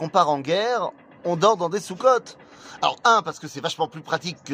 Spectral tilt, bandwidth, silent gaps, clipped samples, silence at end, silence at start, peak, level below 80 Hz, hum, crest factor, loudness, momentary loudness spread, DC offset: -4 dB/octave; 15.5 kHz; none; under 0.1%; 0 s; 0 s; -4 dBFS; -70 dBFS; none; 20 dB; -22 LUFS; 11 LU; under 0.1%